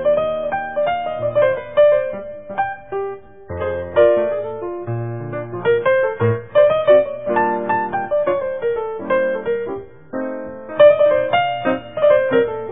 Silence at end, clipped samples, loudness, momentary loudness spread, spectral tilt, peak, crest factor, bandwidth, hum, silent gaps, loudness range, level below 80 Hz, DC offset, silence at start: 0 s; under 0.1%; -18 LUFS; 13 LU; -10.5 dB/octave; 0 dBFS; 18 dB; 3.8 kHz; none; none; 4 LU; -52 dBFS; 0.6%; 0 s